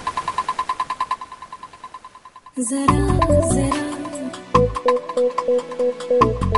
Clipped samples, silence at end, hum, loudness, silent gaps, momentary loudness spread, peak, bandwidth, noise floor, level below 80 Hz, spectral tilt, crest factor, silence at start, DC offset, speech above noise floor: under 0.1%; 0 s; none; -20 LUFS; none; 20 LU; 0 dBFS; 11.5 kHz; -44 dBFS; -34 dBFS; -6 dB/octave; 20 dB; 0 s; under 0.1%; 26 dB